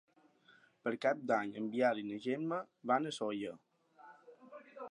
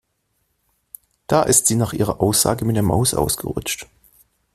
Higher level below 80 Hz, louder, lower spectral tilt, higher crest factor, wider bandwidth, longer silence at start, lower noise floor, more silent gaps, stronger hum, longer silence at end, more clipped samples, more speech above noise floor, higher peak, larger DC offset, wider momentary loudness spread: second, -88 dBFS vs -44 dBFS; second, -37 LUFS vs -18 LUFS; first, -5.5 dB/octave vs -4 dB/octave; about the same, 20 dB vs 20 dB; second, 11 kHz vs 16 kHz; second, 0.85 s vs 1.3 s; about the same, -67 dBFS vs -70 dBFS; neither; neither; second, 0.05 s vs 0.7 s; neither; second, 31 dB vs 51 dB; second, -18 dBFS vs 0 dBFS; neither; first, 22 LU vs 11 LU